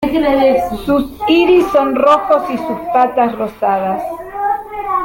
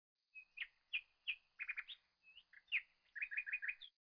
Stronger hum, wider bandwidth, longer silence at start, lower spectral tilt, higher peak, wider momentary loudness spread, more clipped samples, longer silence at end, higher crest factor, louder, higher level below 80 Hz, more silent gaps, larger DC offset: neither; first, 17 kHz vs 5.4 kHz; second, 0 s vs 0.35 s; first, -6 dB/octave vs 7 dB/octave; first, 0 dBFS vs -30 dBFS; second, 10 LU vs 19 LU; neither; second, 0 s vs 0.2 s; second, 14 dB vs 20 dB; first, -14 LUFS vs -45 LUFS; first, -40 dBFS vs -86 dBFS; neither; neither